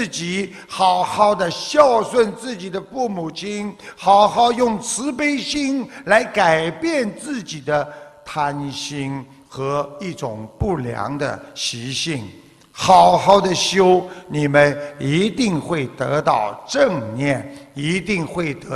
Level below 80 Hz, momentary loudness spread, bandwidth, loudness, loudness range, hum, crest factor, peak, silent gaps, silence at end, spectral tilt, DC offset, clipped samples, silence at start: -48 dBFS; 14 LU; 13 kHz; -19 LUFS; 9 LU; none; 18 dB; 0 dBFS; none; 0 s; -4.5 dB/octave; under 0.1%; under 0.1%; 0 s